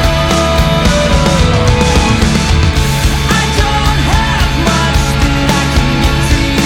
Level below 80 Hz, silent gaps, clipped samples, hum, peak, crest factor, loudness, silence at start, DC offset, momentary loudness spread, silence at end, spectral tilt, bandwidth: -14 dBFS; none; under 0.1%; none; 0 dBFS; 10 dB; -11 LUFS; 0 s; under 0.1%; 2 LU; 0 s; -4.5 dB/octave; 17 kHz